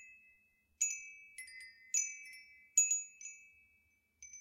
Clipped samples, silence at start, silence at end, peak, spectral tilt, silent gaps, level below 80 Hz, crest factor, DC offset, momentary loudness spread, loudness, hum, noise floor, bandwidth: under 0.1%; 0 s; 0 s; -18 dBFS; 5 dB/octave; none; -86 dBFS; 24 dB; under 0.1%; 24 LU; -34 LUFS; none; -75 dBFS; 16 kHz